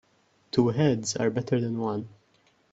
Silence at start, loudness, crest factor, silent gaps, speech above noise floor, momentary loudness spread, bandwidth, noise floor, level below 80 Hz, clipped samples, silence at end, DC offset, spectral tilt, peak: 0.55 s; -27 LUFS; 20 dB; none; 40 dB; 9 LU; 8 kHz; -66 dBFS; -64 dBFS; under 0.1%; 0.65 s; under 0.1%; -6 dB/octave; -8 dBFS